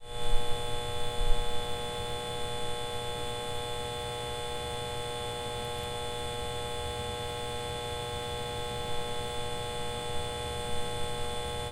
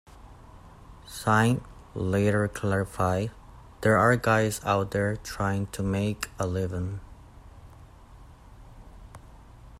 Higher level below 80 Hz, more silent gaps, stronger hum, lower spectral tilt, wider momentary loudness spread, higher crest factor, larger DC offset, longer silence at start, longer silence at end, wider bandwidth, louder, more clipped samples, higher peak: first, -38 dBFS vs -50 dBFS; neither; neither; second, -3.5 dB/octave vs -6 dB/octave; second, 1 LU vs 12 LU; about the same, 20 dB vs 20 dB; neither; second, 0 s vs 0.15 s; about the same, 0 s vs 0 s; about the same, 16 kHz vs 16 kHz; second, -35 LUFS vs -27 LUFS; neither; about the same, -10 dBFS vs -10 dBFS